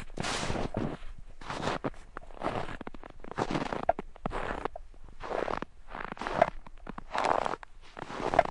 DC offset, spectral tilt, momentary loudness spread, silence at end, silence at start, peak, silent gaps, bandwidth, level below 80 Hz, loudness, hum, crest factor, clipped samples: under 0.1%; -5 dB/octave; 17 LU; 0 s; 0 s; -6 dBFS; none; 11.5 kHz; -46 dBFS; -34 LUFS; none; 28 dB; under 0.1%